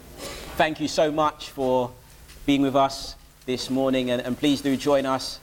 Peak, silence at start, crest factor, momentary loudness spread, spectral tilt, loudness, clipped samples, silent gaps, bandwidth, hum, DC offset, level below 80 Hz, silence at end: -6 dBFS; 0.05 s; 18 dB; 12 LU; -4.5 dB/octave; -24 LUFS; under 0.1%; none; 17 kHz; none; under 0.1%; -48 dBFS; 0.05 s